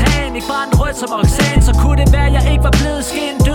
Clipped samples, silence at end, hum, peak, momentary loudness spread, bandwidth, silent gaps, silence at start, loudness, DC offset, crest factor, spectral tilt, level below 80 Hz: under 0.1%; 0 s; none; 0 dBFS; 7 LU; 17 kHz; none; 0 s; -14 LUFS; under 0.1%; 12 dB; -5.5 dB/octave; -14 dBFS